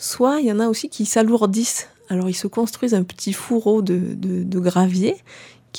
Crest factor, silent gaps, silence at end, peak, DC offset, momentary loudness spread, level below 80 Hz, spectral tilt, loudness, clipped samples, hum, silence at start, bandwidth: 16 dB; none; 0 s; -4 dBFS; under 0.1%; 7 LU; -66 dBFS; -5.5 dB/octave; -20 LUFS; under 0.1%; none; 0 s; 19 kHz